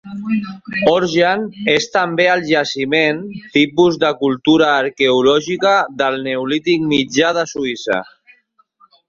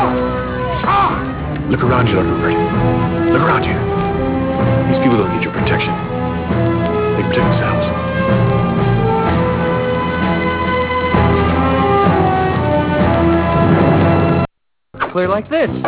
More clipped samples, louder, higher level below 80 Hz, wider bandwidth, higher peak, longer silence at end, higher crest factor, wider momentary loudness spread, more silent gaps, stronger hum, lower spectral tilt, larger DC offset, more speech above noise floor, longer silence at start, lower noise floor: neither; about the same, -15 LUFS vs -15 LUFS; second, -56 dBFS vs -28 dBFS; first, 7.6 kHz vs 4 kHz; about the same, 0 dBFS vs 0 dBFS; first, 1.05 s vs 0 s; about the same, 16 dB vs 14 dB; first, 8 LU vs 5 LU; neither; neither; second, -4.5 dB/octave vs -11 dB/octave; neither; first, 41 dB vs 31 dB; about the same, 0.05 s vs 0 s; first, -56 dBFS vs -45 dBFS